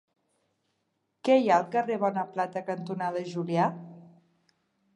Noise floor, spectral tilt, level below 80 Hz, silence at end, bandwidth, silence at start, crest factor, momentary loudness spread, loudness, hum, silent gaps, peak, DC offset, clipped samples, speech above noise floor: -78 dBFS; -7 dB/octave; -84 dBFS; 0.9 s; 10.5 kHz; 1.25 s; 20 dB; 11 LU; -28 LUFS; none; none; -10 dBFS; under 0.1%; under 0.1%; 51 dB